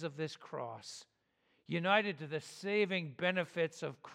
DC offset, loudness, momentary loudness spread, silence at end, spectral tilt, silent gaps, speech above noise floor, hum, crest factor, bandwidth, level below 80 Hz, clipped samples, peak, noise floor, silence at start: under 0.1%; -36 LUFS; 14 LU; 0 s; -5 dB/octave; none; 40 dB; none; 24 dB; 13.5 kHz; -88 dBFS; under 0.1%; -14 dBFS; -77 dBFS; 0 s